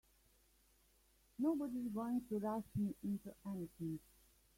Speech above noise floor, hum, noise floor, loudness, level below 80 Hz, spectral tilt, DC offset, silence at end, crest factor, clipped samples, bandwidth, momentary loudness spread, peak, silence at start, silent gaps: 31 dB; none; -73 dBFS; -43 LUFS; -72 dBFS; -8.5 dB/octave; under 0.1%; 0.6 s; 16 dB; under 0.1%; 16.5 kHz; 8 LU; -28 dBFS; 1.4 s; none